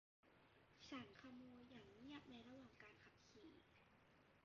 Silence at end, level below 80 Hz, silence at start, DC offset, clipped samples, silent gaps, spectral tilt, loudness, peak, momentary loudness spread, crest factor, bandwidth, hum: 0 s; -84 dBFS; 0.25 s; under 0.1%; under 0.1%; none; -3.5 dB/octave; -62 LUFS; -44 dBFS; 10 LU; 20 dB; 7 kHz; none